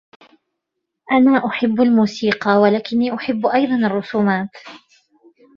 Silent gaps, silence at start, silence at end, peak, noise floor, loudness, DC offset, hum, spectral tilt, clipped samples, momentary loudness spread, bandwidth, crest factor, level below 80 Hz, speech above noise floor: none; 1.1 s; 0.8 s; -2 dBFS; -78 dBFS; -17 LUFS; under 0.1%; none; -7 dB/octave; under 0.1%; 6 LU; 7.2 kHz; 16 dB; -62 dBFS; 62 dB